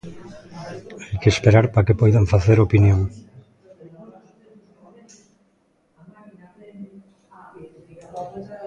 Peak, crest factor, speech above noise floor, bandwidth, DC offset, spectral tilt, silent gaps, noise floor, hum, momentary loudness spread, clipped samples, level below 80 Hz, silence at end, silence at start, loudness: 0 dBFS; 20 dB; 47 dB; 8 kHz; under 0.1%; -7.5 dB/octave; none; -63 dBFS; none; 26 LU; under 0.1%; -38 dBFS; 0 s; 0.05 s; -17 LUFS